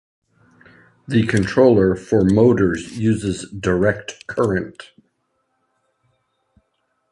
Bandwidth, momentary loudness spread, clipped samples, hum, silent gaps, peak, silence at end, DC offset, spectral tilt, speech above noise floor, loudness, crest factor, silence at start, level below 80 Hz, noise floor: 11.5 kHz; 11 LU; under 0.1%; none; none; -2 dBFS; 2.3 s; under 0.1%; -7 dB/octave; 53 dB; -18 LUFS; 18 dB; 1.1 s; -44 dBFS; -70 dBFS